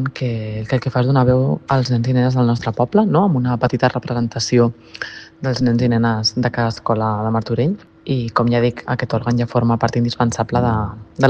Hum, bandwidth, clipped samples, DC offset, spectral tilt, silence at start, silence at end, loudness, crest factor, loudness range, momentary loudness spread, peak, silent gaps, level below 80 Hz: none; 8.4 kHz; under 0.1%; under 0.1%; -6.5 dB/octave; 0 s; 0 s; -18 LUFS; 18 dB; 2 LU; 8 LU; 0 dBFS; none; -44 dBFS